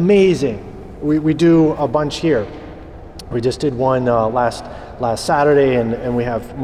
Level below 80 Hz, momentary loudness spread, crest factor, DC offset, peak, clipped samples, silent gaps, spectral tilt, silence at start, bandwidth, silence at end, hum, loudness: -40 dBFS; 20 LU; 12 dB; under 0.1%; -4 dBFS; under 0.1%; none; -6.5 dB/octave; 0 s; 13 kHz; 0 s; none; -16 LUFS